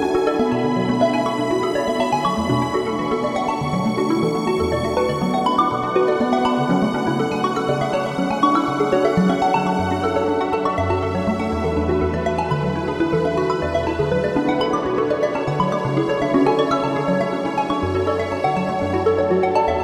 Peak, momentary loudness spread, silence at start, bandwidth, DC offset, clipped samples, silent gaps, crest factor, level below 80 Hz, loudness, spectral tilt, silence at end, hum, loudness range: -4 dBFS; 4 LU; 0 s; 14 kHz; under 0.1%; under 0.1%; none; 16 dB; -42 dBFS; -20 LUFS; -6.5 dB/octave; 0 s; none; 2 LU